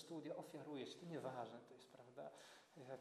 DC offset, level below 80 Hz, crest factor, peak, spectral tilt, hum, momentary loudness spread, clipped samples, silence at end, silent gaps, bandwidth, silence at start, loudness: under 0.1%; under -90 dBFS; 18 dB; -36 dBFS; -5.5 dB/octave; none; 12 LU; under 0.1%; 0 s; none; 13 kHz; 0 s; -54 LUFS